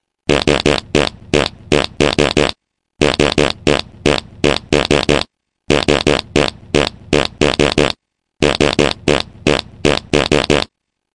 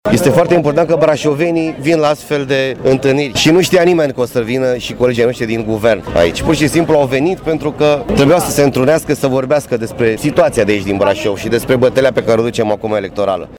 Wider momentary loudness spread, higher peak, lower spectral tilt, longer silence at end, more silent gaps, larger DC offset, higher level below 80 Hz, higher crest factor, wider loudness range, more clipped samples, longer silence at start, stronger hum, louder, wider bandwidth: about the same, 4 LU vs 6 LU; about the same, 0 dBFS vs -2 dBFS; about the same, -4.5 dB/octave vs -5.5 dB/octave; first, 0.5 s vs 0 s; neither; first, 0.8% vs under 0.1%; first, -32 dBFS vs -38 dBFS; first, 16 dB vs 10 dB; about the same, 1 LU vs 1 LU; neither; first, 0.3 s vs 0.05 s; neither; about the same, -15 LUFS vs -13 LUFS; second, 11.5 kHz vs over 20 kHz